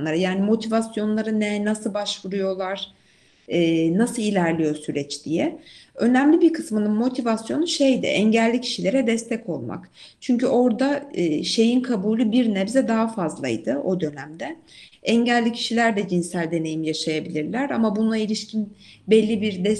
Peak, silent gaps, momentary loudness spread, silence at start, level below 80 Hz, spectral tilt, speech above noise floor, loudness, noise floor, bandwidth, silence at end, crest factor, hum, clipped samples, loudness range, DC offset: -4 dBFS; none; 10 LU; 0 s; -64 dBFS; -5.5 dB/octave; 36 dB; -22 LUFS; -58 dBFS; 12 kHz; 0 s; 18 dB; none; under 0.1%; 3 LU; under 0.1%